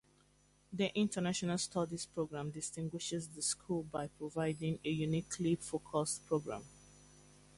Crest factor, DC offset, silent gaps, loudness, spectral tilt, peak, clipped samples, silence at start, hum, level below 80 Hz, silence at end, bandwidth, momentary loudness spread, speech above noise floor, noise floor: 18 dB; under 0.1%; none; -38 LUFS; -4.5 dB/octave; -20 dBFS; under 0.1%; 0.7 s; 50 Hz at -60 dBFS; -68 dBFS; 0.35 s; 11.5 kHz; 7 LU; 32 dB; -70 dBFS